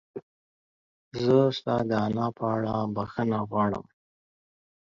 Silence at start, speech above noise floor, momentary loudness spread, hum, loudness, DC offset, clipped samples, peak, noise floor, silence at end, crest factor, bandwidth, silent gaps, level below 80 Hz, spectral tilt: 0.15 s; over 64 dB; 14 LU; none; -27 LUFS; under 0.1%; under 0.1%; -10 dBFS; under -90 dBFS; 1.1 s; 20 dB; 7.4 kHz; 0.22-1.11 s; -60 dBFS; -8 dB/octave